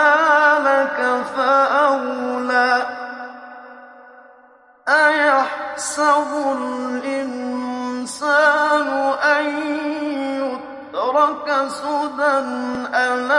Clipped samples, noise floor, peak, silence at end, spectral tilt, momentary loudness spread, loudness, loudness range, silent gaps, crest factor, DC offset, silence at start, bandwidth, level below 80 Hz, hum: under 0.1%; -50 dBFS; -2 dBFS; 0 s; -2 dB/octave; 12 LU; -18 LUFS; 3 LU; none; 16 dB; under 0.1%; 0 s; 11.5 kHz; -68 dBFS; none